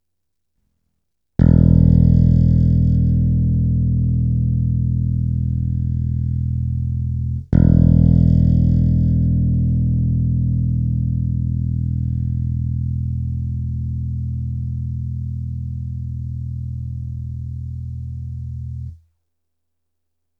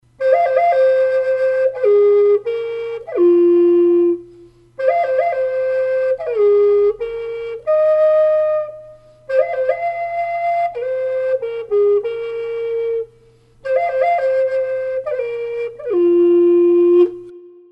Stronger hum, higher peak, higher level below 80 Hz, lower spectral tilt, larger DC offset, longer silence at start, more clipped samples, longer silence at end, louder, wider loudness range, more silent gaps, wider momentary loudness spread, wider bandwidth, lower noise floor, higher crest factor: neither; about the same, 0 dBFS vs -2 dBFS; first, -26 dBFS vs -58 dBFS; first, -12.5 dB/octave vs -7 dB/octave; neither; first, 1.4 s vs 0.2 s; neither; first, 1.45 s vs 0.25 s; second, -19 LUFS vs -16 LUFS; first, 12 LU vs 5 LU; neither; first, 15 LU vs 12 LU; second, 1.9 kHz vs 5.6 kHz; first, -79 dBFS vs -50 dBFS; about the same, 18 dB vs 14 dB